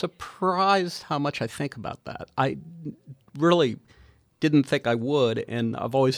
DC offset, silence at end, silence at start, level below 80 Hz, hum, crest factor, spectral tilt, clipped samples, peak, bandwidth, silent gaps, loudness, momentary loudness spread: under 0.1%; 0 s; 0 s; -62 dBFS; none; 20 dB; -6 dB/octave; under 0.1%; -6 dBFS; 14.5 kHz; none; -25 LUFS; 16 LU